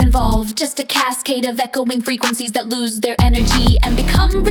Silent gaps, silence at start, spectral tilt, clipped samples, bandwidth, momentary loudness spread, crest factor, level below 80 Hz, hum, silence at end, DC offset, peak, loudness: none; 0 s; -4.5 dB/octave; under 0.1%; 18 kHz; 6 LU; 14 dB; -18 dBFS; none; 0 s; under 0.1%; 0 dBFS; -17 LUFS